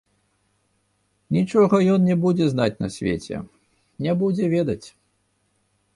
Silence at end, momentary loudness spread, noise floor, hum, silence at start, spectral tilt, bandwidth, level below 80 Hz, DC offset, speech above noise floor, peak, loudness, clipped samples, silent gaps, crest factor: 1.05 s; 14 LU; -68 dBFS; 50 Hz at -50 dBFS; 1.3 s; -7.5 dB/octave; 11.5 kHz; -54 dBFS; under 0.1%; 48 dB; -6 dBFS; -21 LUFS; under 0.1%; none; 16 dB